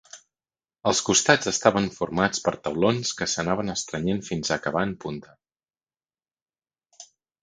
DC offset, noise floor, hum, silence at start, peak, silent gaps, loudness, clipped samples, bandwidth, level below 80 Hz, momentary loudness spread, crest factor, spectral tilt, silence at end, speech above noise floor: under 0.1%; under -90 dBFS; none; 0.15 s; 0 dBFS; 6.42-6.46 s; -24 LUFS; under 0.1%; 10 kHz; -56 dBFS; 9 LU; 26 dB; -3.5 dB/octave; 0.4 s; over 66 dB